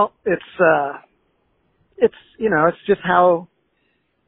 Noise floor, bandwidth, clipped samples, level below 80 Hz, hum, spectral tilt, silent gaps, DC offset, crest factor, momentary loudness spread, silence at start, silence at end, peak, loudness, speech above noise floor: -67 dBFS; 4 kHz; under 0.1%; -56 dBFS; none; -4.5 dB/octave; none; under 0.1%; 18 dB; 9 LU; 0 s; 0.85 s; 0 dBFS; -18 LUFS; 49 dB